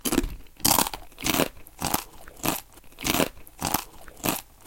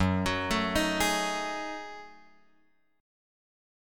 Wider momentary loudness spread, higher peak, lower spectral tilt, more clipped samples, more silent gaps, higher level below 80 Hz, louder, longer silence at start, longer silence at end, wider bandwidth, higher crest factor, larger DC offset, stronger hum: second, 11 LU vs 14 LU; first, -2 dBFS vs -14 dBFS; second, -2.5 dB/octave vs -4 dB/octave; neither; neither; first, -42 dBFS vs -50 dBFS; about the same, -27 LUFS vs -29 LUFS; about the same, 0.05 s vs 0 s; second, 0.25 s vs 1 s; about the same, 17.5 kHz vs 17.5 kHz; first, 26 dB vs 18 dB; neither; neither